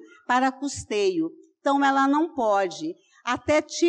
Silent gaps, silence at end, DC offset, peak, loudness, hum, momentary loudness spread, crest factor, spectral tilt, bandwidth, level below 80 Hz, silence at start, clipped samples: none; 0 s; under 0.1%; -12 dBFS; -24 LUFS; none; 12 LU; 12 dB; -3.5 dB/octave; 10 kHz; -60 dBFS; 0.3 s; under 0.1%